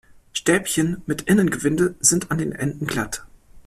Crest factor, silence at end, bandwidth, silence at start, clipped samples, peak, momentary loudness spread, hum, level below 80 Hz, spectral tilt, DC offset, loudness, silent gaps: 20 dB; 0.05 s; 15 kHz; 0.35 s; under 0.1%; -2 dBFS; 9 LU; none; -48 dBFS; -4 dB/octave; under 0.1%; -21 LUFS; none